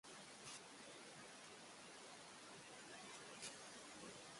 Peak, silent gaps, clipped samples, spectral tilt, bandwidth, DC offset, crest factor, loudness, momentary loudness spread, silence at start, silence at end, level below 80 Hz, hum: -38 dBFS; none; under 0.1%; -1.5 dB/octave; 11.5 kHz; under 0.1%; 20 dB; -56 LUFS; 5 LU; 0.05 s; 0 s; -88 dBFS; none